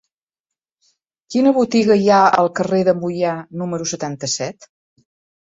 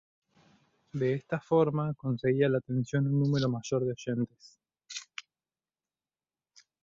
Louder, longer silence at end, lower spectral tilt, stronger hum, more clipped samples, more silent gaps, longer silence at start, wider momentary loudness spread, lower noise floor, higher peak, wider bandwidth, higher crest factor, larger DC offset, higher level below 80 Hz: first, -17 LUFS vs -30 LUFS; second, 0.9 s vs 1.6 s; second, -5 dB/octave vs -7 dB/octave; neither; neither; neither; first, 1.3 s vs 0.95 s; second, 11 LU vs 15 LU; second, -86 dBFS vs under -90 dBFS; first, -2 dBFS vs -14 dBFS; about the same, 8 kHz vs 7.6 kHz; about the same, 16 dB vs 18 dB; neither; first, -62 dBFS vs -68 dBFS